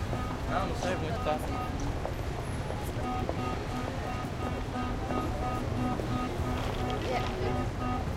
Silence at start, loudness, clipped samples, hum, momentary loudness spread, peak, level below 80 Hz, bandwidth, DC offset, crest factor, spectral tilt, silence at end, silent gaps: 0 s; -33 LUFS; under 0.1%; none; 4 LU; -16 dBFS; -40 dBFS; 16 kHz; under 0.1%; 16 dB; -6 dB/octave; 0 s; none